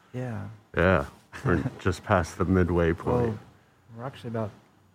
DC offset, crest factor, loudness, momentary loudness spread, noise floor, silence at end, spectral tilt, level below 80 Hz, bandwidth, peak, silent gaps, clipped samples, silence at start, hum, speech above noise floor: under 0.1%; 20 dB; -27 LUFS; 15 LU; -53 dBFS; 0.4 s; -7.5 dB/octave; -44 dBFS; 14.5 kHz; -6 dBFS; none; under 0.1%; 0.15 s; none; 27 dB